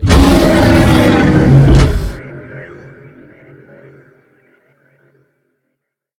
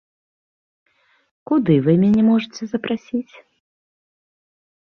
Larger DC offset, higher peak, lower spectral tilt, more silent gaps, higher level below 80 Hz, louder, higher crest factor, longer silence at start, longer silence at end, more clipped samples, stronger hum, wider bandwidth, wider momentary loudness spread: neither; first, 0 dBFS vs -4 dBFS; second, -6.5 dB/octave vs -8 dB/octave; neither; first, -20 dBFS vs -58 dBFS; first, -9 LUFS vs -18 LUFS; second, 12 dB vs 18 dB; second, 0 s vs 1.5 s; first, 3.55 s vs 1.65 s; first, 0.3% vs under 0.1%; neither; first, 16.5 kHz vs 6.6 kHz; first, 23 LU vs 13 LU